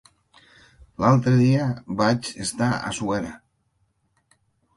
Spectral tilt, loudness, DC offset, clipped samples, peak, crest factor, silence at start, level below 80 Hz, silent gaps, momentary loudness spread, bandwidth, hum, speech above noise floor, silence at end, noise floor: -6 dB/octave; -22 LUFS; under 0.1%; under 0.1%; -4 dBFS; 20 dB; 1 s; -54 dBFS; none; 10 LU; 11.5 kHz; none; 48 dB; 1.4 s; -69 dBFS